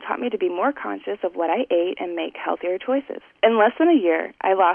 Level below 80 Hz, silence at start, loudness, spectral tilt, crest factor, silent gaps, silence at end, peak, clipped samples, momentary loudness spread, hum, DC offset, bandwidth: -70 dBFS; 0 s; -22 LUFS; -7.5 dB/octave; 16 dB; none; 0 s; -6 dBFS; under 0.1%; 10 LU; none; under 0.1%; 3.5 kHz